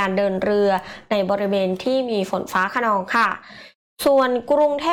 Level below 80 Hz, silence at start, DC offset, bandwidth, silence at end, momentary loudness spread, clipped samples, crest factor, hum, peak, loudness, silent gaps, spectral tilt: -58 dBFS; 0 s; under 0.1%; 17.5 kHz; 0 s; 5 LU; under 0.1%; 12 dB; none; -8 dBFS; -20 LUFS; 3.75-3.96 s; -5 dB/octave